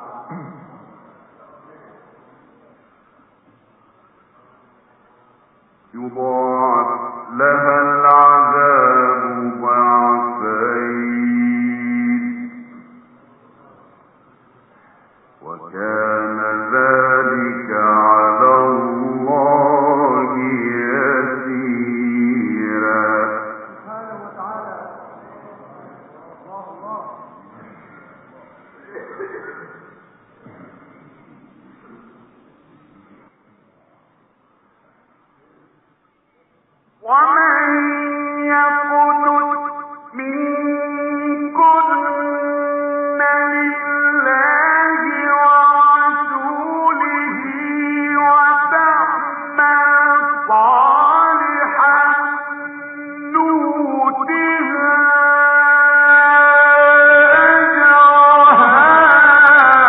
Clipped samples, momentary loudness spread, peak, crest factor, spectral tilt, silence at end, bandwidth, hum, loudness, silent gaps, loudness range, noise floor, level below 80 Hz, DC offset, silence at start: under 0.1%; 21 LU; 0 dBFS; 16 dB; -9 dB/octave; 0 s; 4 kHz; none; -13 LUFS; none; 16 LU; -60 dBFS; -66 dBFS; under 0.1%; 0 s